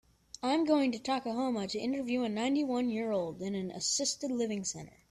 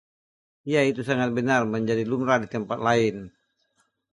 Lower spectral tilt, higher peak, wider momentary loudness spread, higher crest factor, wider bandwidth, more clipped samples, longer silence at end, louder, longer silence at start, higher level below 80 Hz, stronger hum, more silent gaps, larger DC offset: second, -3.5 dB/octave vs -6 dB/octave; second, -16 dBFS vs -6 dBFS; about the same, 8 LU vs 6 LU; about the same, 18 dB vs 18 dB; first, 13 kHz vs 11.5 kHz; neither; second, 0.2 s vs 0.85 s; second, -33 LUFS vs -24 LUFS; second, 0.45 s vs 0.65 s; second, -70 dBFS vs -62 dBFS; neither; neither; neither